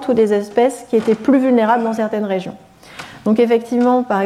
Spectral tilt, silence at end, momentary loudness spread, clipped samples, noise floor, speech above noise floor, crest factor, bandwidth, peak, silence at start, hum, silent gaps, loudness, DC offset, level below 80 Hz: -6.5 dB/octave; 0 s; 10 LU; under 0.1%; -36 dBFS; 21 dB; 12 dB; 13.5 kHz; -4 dBFS; 0 s; none; none; -16 LUFS; under 0.1%; -58 dBFS